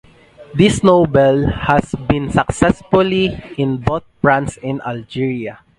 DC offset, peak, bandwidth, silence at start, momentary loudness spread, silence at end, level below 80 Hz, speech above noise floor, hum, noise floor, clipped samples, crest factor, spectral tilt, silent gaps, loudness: under 0.1%; 0 dBFS; 11.5 kHz; 0.4 s; 11 LU; 0.25 s; -34 dBFS; 26 dB; none; -42 dBFS; under 0.1%; 16 dB; -6.5 dB/octave; none; -16 LUFS